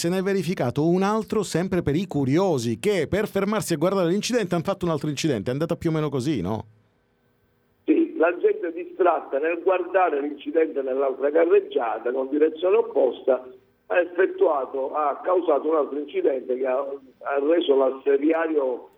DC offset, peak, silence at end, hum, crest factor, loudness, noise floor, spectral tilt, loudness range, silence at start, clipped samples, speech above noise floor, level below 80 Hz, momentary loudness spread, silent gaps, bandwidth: under 0.1%; -8 dBFS; 0.1 s; none; 16 dB; -23 LUFS; -65 dBFS; -6 dB/octave; 3 LU; 0 s; under 0.1%; 43 dB; -58 dBFS; 5 LU; none; 15.5 kHz